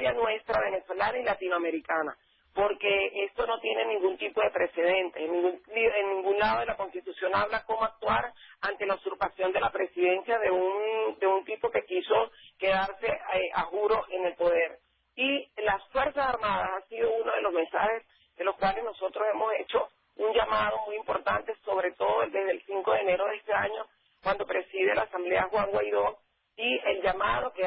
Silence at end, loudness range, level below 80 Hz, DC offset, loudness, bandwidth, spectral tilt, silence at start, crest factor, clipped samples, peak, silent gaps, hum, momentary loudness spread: 0 s; 2 LU; -58 dBFS; under 0.1%; -29 LUFS; 5.8 kHz; -8 dB/octave; 0 s; 16 dB; under 0.1%; -14 dBFS; none; none; 6 LU